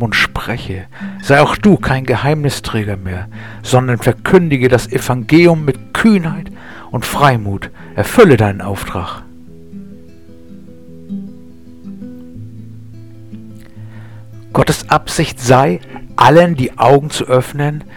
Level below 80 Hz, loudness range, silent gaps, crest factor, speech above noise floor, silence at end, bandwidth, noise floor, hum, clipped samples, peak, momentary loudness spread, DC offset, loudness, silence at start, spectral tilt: -36 dBFS; 20 LU; none; 14 dB; 27 dB; 0.1 s; 19 kHz; -39 dBFS; none; 0.2%; 0 dBFS; 24 LU; 1%; -13 LUFS; 0 s; -6 dB/octave